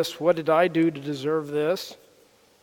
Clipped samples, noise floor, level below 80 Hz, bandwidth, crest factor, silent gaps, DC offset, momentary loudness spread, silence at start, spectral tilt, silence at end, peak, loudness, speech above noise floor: under 0.1%; -58 dBFS; -74 dBFS; 18 kHz; 18 dB; none; under 0.1%; 9 LU; 0 s; -5.5 dB/octave; 0.7 s; -6 dBFS; -24 LUFS; 34 dB